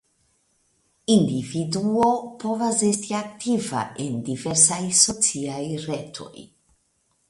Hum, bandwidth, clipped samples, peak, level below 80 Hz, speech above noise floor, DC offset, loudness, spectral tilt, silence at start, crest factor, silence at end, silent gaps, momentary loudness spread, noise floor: none; 12 kHz; under 0.1%; 0 dBFS; -60 dBFS; 45 dB; under 0.1%; -22 LUFS; -3.5 dB/octave; 1.1 s; 24 dB; 0.85 s; none; 13 LU; -68 dBFS